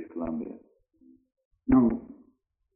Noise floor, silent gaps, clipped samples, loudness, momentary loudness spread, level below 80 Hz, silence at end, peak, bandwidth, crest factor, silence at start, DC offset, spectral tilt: -69 dBFS; 1.45-1.51 s; under 0.1%; -27 LUFS; 19 LU; -50 dBFS; 0.65 s; -10 dBFS; 2.7 kHz; 20 dB; 0 s; under 0.1%; -11.5 dB/octave